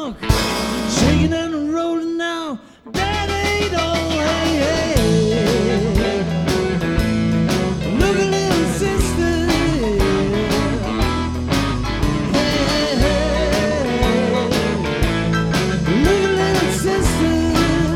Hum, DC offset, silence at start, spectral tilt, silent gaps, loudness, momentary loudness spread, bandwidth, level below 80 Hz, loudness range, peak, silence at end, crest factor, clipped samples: none; under 0.1%; 0 s; -5 dB/octave; none; -18 LUFS; 4 LU; 17.5 kHz; -28 dBFS; 2 LU; 0 dBFS; 0 s; 18 dB; under 0.1%